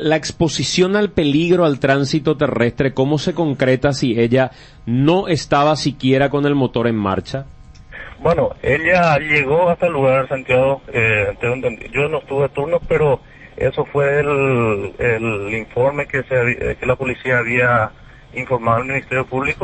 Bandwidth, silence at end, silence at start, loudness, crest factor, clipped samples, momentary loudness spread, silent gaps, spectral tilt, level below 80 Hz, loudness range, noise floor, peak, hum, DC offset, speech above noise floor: 8.8 kHz; 0 s; 0 s; -17 LUFS; 16 dB; under 0.1%; 7 LU; none; -6 dB/octave; -40 dBFS; 3 LU; -36 dBFS; 0 dBFS; none; under 0.1%; 20 dB